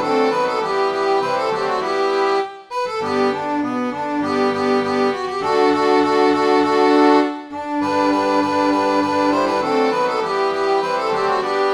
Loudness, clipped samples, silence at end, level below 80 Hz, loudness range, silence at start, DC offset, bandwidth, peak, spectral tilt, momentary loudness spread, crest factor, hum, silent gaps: -18 LUFS; under 0.1%; 0 s; -60 dBFS; 4 LU; 0 s; under 0.1%; 11.5 kHz; -2 dBFS; -4.5 dB/octave; 7 LU; 16 dB; none; none